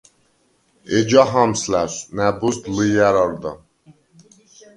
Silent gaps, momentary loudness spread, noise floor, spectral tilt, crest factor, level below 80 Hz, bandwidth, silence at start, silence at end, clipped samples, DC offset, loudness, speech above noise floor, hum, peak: none; 9 LU; -62 dBFS; -5 dB/octave; 20 dB; -50 dBFS; 11.5 kHz; 0.9 s; 1.2 s; under 0.1%; under 0.1%; -18 LUFS; 44 dB; none; 0 dBFS